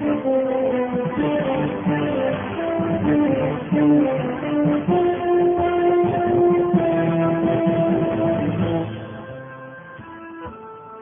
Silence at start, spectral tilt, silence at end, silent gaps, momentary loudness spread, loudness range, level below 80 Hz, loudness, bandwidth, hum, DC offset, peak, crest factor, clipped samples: 0 s; -12 dB/octave; 0 s; none; 18 LU; 4 LU; -50 dBFS; -20 LUFS; 3.6 kHz; none; under 0.1%; -6 dBFS; 14 dB; under 0.1%